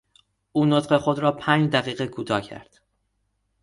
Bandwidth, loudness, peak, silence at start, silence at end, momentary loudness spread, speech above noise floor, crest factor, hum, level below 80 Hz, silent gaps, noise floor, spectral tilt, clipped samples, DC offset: 11.5 kHz; -23 LUFS; -4 dBFS; 0.55 s; 1 s; 10 LU; 50 dB; 20 dB; none; -60 dBFS; none; -72 dBFS; -6.5 dB/octave; under 0.1%; under 0.1%